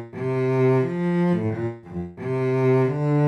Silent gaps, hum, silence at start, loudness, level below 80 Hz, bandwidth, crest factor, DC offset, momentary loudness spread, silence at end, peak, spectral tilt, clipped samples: none; none; 0 s; -22 LUFS; -58 dBFS; 6.6 kHz; 12 dB; under 0.1%; 11 LU; 0 s; -10 dBFS; -9.5 dB/octave; under 0.1%